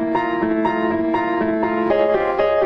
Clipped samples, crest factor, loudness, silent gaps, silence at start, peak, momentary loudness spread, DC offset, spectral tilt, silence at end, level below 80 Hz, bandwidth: under 0.1%; 14 dB; -19 LUFS; none; 0 s; -6 dBFS; 3 LU; under 0.1%; -8 dB/octave; 0 s; -48 dBFS; 6 kHz